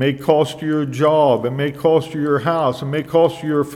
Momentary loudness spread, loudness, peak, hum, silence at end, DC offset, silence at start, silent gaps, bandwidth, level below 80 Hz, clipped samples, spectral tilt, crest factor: 6 LU; -17 LUFS; 0 dBFS; none; 0 s; under 0.1%; 0 s; none; 15 kHz; -56 dBFS; under 0.1%; -7 dB/octave; 16 dB